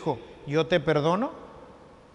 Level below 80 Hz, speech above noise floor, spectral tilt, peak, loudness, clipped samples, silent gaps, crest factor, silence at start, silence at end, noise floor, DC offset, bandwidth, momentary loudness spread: -58 dBFS; 24 dB; -6.5 dB/octave; -8 dBFS; -26 LUFS; under 0.1%; none; 20 dB; 0 s; 0.35 s; -50 dBFS; under 0.1%; 10.5 kHz; 18 LU